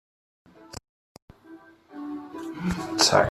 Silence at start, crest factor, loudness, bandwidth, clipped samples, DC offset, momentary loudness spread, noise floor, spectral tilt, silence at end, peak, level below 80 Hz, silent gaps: 0.6 s; 26 dB; -25 LUFS; 14.5 kHz; under 0.1%; under 0.1%; 25 LU; -50 dBFS; -3 dB/octave; 0 s; -4 dBFS; -52 dBFS; 0.89-1.15 s, 1.22-1.28 s